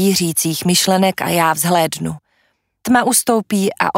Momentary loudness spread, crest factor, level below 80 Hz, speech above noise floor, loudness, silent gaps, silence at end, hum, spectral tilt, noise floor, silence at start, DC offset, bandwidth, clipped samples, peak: 11 LU; 16 dB; -56 dBFS; 48 dB; -15 LUFS; none; 0 s; none; -3.5 dB/octave; -63 dBFS; 0 s; under 0.1%; 16.5 kHz; under 0.1%; 0 dBFS